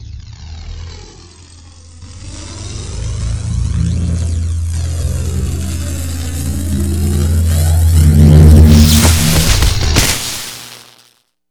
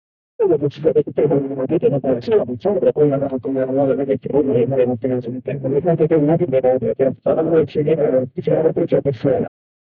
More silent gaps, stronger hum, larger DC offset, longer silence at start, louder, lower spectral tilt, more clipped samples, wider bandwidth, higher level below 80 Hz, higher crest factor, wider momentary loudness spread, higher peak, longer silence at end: neither; neither; neither; second, 0 s vs 0.4 s; first, -12 LUFS vs -18 LUFS; second, -5 dB/octave vs -11 dB/octave; first, 0.9% vs under 0.1%; first, over 20 kHz vs 5.2 kHz; first, -18 dBFS vs -52 dBFS; about the same, 12 dB vs 14 dB; first, 23 LU vs 5 LU; first, 0 dBFS vs -4 dBFS; first, 0.65 s vs 0.5 s